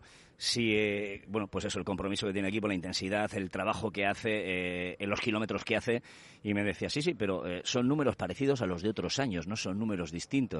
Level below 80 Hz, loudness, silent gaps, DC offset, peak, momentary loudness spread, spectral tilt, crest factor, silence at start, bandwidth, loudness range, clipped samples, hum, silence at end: -62 dBFS; -33 LUFS; none; under 0.1%; -14 dBFS; 6 LU; -4.5 dB/octave; 18 dB; 0.05 s; 11.5 kHz; 1 LU; under 0.1%; none; 0 s